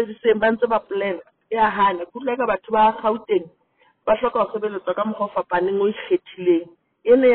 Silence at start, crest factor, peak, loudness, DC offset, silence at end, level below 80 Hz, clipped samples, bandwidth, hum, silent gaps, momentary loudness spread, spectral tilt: 0 s; 16 dB; -4 dBFS; -21 LUFS; under 0.1%; 0 s; -56 dBFS; under 0.1%; 4.3 kHz; none; none; 8 LU; -3.5 dB/octave